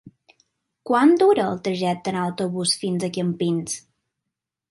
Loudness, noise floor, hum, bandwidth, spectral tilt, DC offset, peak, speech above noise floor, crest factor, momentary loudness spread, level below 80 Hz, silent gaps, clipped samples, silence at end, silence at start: -22 LUFS; -84 dBFS; none; 11.5 kHz; -5 dB/octave; under 0.1%; -6 dBFS; 63 dB; 18 dB; 10 LU; -66 dBFS; none; under 0.1%; 0.9 s; 0.05 s